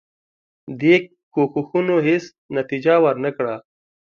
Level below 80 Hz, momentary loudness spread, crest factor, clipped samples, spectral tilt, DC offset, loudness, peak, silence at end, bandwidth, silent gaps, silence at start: -66 dBFS; 11 LU; 18 dB; under 0.1%; -7 dB/octave; under 0.1%; -19 LUFS; -2 dBFS; 0.55 s; 7 kHz; 1.23-1.31 s, 2.38-2.49 s; 0.65 s